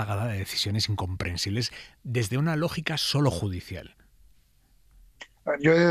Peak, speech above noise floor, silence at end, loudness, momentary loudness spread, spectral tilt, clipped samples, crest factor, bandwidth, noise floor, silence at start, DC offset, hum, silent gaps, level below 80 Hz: -8 dBFS; 35 dB; 0 s; -27 LUFS; 15 LU; -5 dB/octave; under 0.1%; 20 dB; 15.5 kHz; -62 dBFS; 0 s; under 0.1%; none; none; -52 dBFS